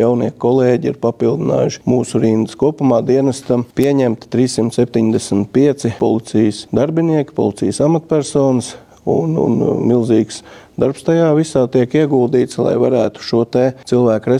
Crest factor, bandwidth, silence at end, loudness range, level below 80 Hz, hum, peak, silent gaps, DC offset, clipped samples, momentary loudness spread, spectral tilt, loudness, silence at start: 12 dB; 13.5 kHz; 0 s; 1 LU; -50 dBFS; none; -2 dBFS; none; under 0.1%; under 0.1%; 4 LU; -7 dB/octave; -15 LUFS; 0 s